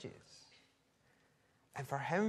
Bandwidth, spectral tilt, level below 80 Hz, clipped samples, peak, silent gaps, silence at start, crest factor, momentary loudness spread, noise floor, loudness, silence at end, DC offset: 13.5 kHz; -6 dB/octave; -82 dBFS; under 0.1%; -22 dBFS; none; 0 s; 22 dB; 21 LU; -74 dBFS; -43 LUFS; 0 s; under 0.1%